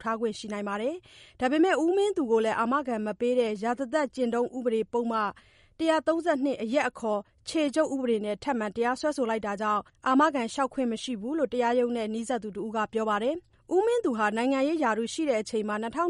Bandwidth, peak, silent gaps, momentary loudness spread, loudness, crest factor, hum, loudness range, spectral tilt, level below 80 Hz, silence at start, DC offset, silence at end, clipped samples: 11.5 kHz; -12 dBFS; none; 7 LU; -28 LUFS; 16 dB; none; 2 LU; -4.5 dB/octave; -64 dBFS; 0 s; under 0.1%; 0 s; under 0.1%